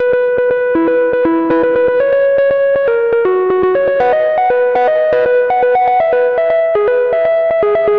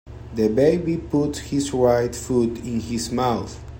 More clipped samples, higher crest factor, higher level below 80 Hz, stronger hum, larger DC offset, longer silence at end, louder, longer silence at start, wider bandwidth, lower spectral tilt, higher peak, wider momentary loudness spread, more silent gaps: neither; second, 6 dB vs 16 dB; second, -48 dBFS vs -42 dBFS; neither; first, 0.3% vs under 0.1%; about the same, 0 s vs 0 s; first, -12 LUFS vs -22 LUFS; about the same, 0 s vs 0.05 s; second, 4.9 kHz vs 16.5 kHz; first, -8 dB/octave vs -6 dB/octave; about the same, -6 dBFS vs -4 dBFS; second, 1 LU vs 8 LU; neither